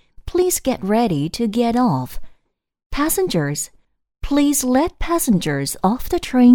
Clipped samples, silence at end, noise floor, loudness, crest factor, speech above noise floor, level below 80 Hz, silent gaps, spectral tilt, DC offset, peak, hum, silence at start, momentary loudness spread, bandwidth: under 0.1%; 0 s; -64 dBFS; -19 LUFS; 16 dB; 47 dB; -36 dBFS; 2.86-2.90 s; -5 dB/octave; under 0.1%; -2 dBFS; none; 0.25 s; 8 LU; over 20 kHz